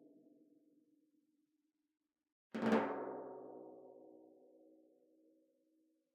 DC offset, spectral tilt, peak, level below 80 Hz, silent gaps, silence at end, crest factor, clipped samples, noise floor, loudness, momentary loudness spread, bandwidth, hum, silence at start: under 0.1%; -6.5 dB/octave; -22 dBFS; -90 dBFS; none; 1.9 s; 26 dB; under 0.1%; -86 dBFS; -41 LUFS; 24 LU; 9 kHz; none; 2.55 s